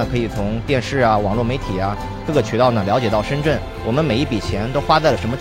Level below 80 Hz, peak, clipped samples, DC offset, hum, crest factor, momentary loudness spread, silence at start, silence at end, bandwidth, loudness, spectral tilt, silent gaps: -32 dBFS; 0 dBFS; under 0.1%; under 0.1%; none; 18 dB; 7 LU; 0 s; 0 s; 15.5 kHz; -19 LUFS; -6.5 dB/octave; none